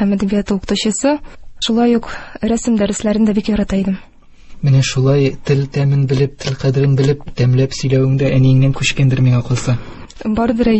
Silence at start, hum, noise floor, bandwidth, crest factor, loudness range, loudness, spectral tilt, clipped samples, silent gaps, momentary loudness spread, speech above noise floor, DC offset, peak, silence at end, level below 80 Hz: 0 s; none; -35 dBFS; 8.6 kHz; 14 dB; 3 LU; -15 LUFS; -6.5 dB/octave; under 0.1%; none; 8 LU; 21 dB; under 0.1%; -2 dBFS; 0 s; -36 dBFS